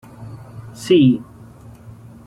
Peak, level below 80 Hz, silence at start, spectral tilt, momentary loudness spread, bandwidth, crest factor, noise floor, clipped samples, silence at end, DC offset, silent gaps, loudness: -4 dBFS; -52 dBFS; 0.2 s; -7 dB/octave; 24 LU; 12.5 kHz; 16 dB; -41 dBFS; under 0.1%; 1.05 s; under 0.1%; none; -15 LUFS